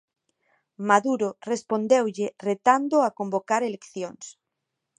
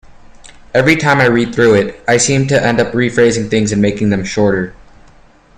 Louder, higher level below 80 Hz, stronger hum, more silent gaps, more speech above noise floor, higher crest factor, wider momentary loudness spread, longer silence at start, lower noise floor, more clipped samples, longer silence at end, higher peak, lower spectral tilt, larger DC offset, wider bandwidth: second, -24 LUFS vs -12 LUFS; second, -78 dBFS vs -40 dBFS; neither; neither; first, 58 dB vs 32 dB; first, 22 dB vs 14 dB; first, 14 LU vs 5 LU; first, 0.8 s vs 0.1 s; first, -82 dBFS vs -44 dBFS; neither; second, 0.7 s vs 0.85 s; second, -4 dBFS vs 0 dBFS; about the same, -5 dB/octave vs -5 dB/octave; neither; second, 10 kHz vs 14 kHz